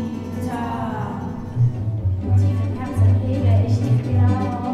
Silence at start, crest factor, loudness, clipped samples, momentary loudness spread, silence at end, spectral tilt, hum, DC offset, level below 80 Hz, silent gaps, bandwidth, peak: 0 s; 12 dB; -21 LUFS; under 0.1%; 9 LU; 0 s; -9 dB/octave; none; under 0.1%; -40 dBFS; none; 6.8 kHz; -6 dBFS